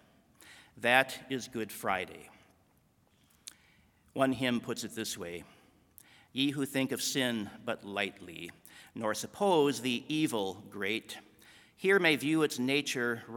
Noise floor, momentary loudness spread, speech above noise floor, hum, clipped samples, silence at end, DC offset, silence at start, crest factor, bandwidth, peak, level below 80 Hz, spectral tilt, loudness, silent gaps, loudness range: -69 dBFS; 19 LU; 36 dB; none; under 0.1%; 0 s; under 0.1%; 0.45 s; 26 dB; 18 kHz; -8 dBFS; -74 dBFS; -3.5 dB/octave; -32 LUFS; none; 6 LU